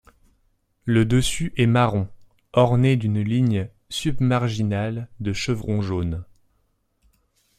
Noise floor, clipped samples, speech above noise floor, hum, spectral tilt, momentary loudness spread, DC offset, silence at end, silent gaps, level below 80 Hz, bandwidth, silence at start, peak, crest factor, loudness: -68 dBFS; under 0.1%; 47 dB; none; -6.5 dB/octave; 11 LU; under 0.1%; 1.35 s; none; -44 dBFS; 14 kHz; 0.85 s; -4 dBFS; 18 dB; -22 LUFS